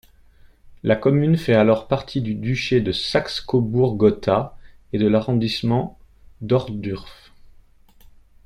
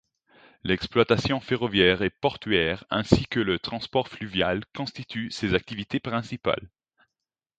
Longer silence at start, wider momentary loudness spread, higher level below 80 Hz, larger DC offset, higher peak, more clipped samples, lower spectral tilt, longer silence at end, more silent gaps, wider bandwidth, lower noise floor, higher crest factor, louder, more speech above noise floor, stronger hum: second, 0.45 s vs 0.65 s; about the same, 12 LU vs 10 LU; about the same, -46 dBFS vs -48 dBFS; neither; second, -4 dBFS vs 0 dBFS; neither; about the same, -7 dB/octave vs -6 dB/octave; first, 1.35 s vs 0.9 s; neither; first, 12 kHz vs 9 kHz; second, -50 dBFS vs -88 dBFS; second, 18 dB vs 26 dB; first, -20 LUFS vs -26 LUFS; second, 31 dB vs 62 dB; neither